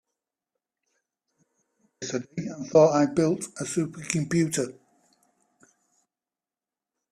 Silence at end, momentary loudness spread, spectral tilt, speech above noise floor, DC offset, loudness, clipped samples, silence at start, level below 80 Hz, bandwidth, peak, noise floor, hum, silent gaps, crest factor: 2.4 s; 15 LU; -5.5 dB/octave; over 66 dB; under 0.1%; -25 LUFS; under 0.1%; 2 s; -68 dBFS; 14 kHz; -6 dBFS; under -90 dBFS; none; none; 22 dB